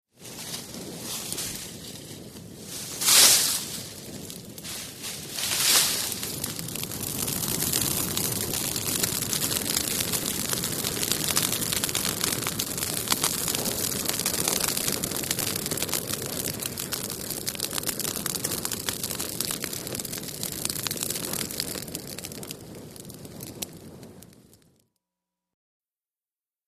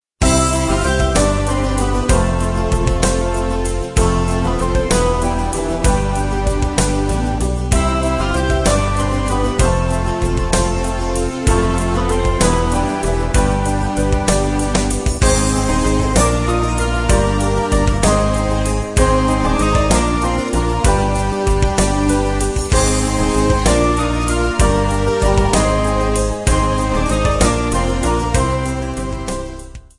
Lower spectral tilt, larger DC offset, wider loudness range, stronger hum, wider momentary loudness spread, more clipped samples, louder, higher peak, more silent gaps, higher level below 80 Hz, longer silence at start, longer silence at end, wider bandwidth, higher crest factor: second, -1.5 dB/octave vs -5 dB/octave; neither; first, 12 LU vs 2 LU; neither; first, 15 LU vs 4 LU; neither; second, -25 LUFS vs -16 LUFS; about the same, -2 dBFS vs 0 dBFS; neither; second, -54 dBFS vs -20 dBFS; about the same, 0.2 s vs 0.2 s; first, 2.1 s vs 0.2 s; first, 15.5 kHz vs 11.5 kHz; first, 26 dB vs 16 dB